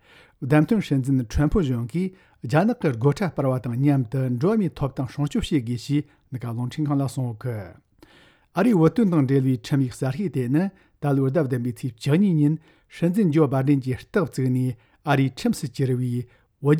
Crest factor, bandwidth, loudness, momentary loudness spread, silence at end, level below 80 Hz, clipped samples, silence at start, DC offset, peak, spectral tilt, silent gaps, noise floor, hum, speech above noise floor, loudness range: 18 dB; 15 kHz; -23 LUFS; 10 LU; 0 s; -44 dBFS; under 0.1%; 0.4 s; under 0.1%; -6 dBFS; -8 dB/octave; none; -55 dBFS; none; 33 dB; 3 LU